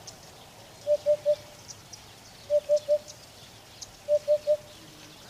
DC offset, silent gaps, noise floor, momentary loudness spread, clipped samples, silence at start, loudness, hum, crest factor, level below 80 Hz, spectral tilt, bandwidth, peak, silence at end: under 0.1%; none; -50 dBFS; 22 LU; under 0.1%; 0.05 s; -28 LUFS; none; 14 dB; -64 dBFS; -3 dB/octave; 15.5 kHz; -16 dBFS; 0.25 s